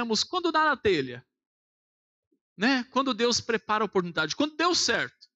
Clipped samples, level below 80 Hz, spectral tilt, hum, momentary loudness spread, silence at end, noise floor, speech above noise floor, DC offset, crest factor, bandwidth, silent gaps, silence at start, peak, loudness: under 0.1%; -64 dBFS; -3 dB/octave; none; 5 LU; 0.25 s; under -90 dBFS; over 64 dB; under 0.1%; 14 dB; 8.6 kHz; 1.46-2.31 s, 2.41-2.56 s; 0 s; -14 dBFS; -26 LUFS